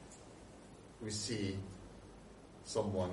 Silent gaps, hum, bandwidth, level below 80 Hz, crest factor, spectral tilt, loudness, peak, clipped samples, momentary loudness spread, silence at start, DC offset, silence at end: none; none; 11.5 kHz; -64 dBFS; 20 dB; -4.5 dB/octave; -41 LUFS; -22 dBFS; under 0.1%; 19 LU; 0 s; under 0.1%; 0 s